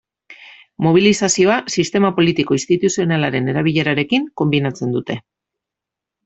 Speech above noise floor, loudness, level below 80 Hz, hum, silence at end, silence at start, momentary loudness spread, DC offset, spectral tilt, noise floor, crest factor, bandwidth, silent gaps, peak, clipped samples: 69 dB; -16 LUFS; -54 dBFS; none; 1.05 s; 0.3 s; 7 LU; under 0.1%; -5 dB/octave; -85 dBFS; 16 dB; 8.4 kHz; none; -2 dBFS; under 0.1%